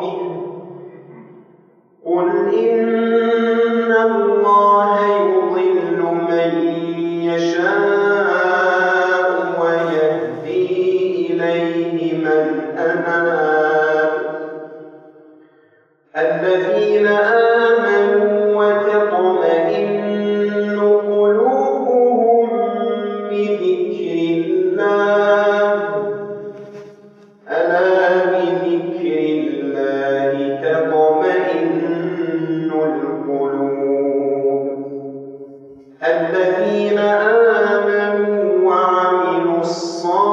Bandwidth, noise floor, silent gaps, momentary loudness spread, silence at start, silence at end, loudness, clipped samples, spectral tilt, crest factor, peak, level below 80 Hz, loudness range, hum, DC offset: 7.6 kHz; -55 dBFS; none; 8 LU; 0 s; 0 s; -16 LUFS; under 0.1%; -6.5 dB/octave; 14 dB; -2 dBFS; -78 dBFS; 5 LU; none; under 0.1%